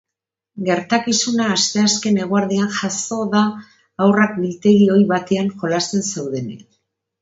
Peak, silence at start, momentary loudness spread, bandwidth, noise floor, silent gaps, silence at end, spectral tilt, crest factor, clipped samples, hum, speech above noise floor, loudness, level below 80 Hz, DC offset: 0 dBFS; 0.55 s; 11 LU; 8 kHz; -84 dBFS; none; 0.6 s; -4.5 dB/octave; 18 dB; under 0.1%; none; 67 dB; -17 LUFS; -62 dBFS; under 0.1%